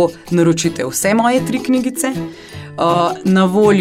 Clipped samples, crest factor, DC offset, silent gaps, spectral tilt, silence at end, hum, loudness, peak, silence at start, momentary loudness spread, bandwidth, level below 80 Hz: under 0.1%; 14 dB; under 0.1%; none; -5 dB/octave; 0 s; none; -15 LUFS; -2 dBFS; 0 s; 11 LU; 16 kHz; -52 dBFS